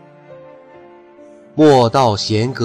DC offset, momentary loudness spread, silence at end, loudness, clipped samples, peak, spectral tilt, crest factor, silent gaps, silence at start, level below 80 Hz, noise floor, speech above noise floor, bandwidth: under 0.1%; 8 LU; 0 s; -13 LUFS; under 0.1%; -2 dBFS; -6 dB/octave; 14 dB; none; 0.3 s; -54 dBFS; -42 dBFS; 29 dB; 12 kHz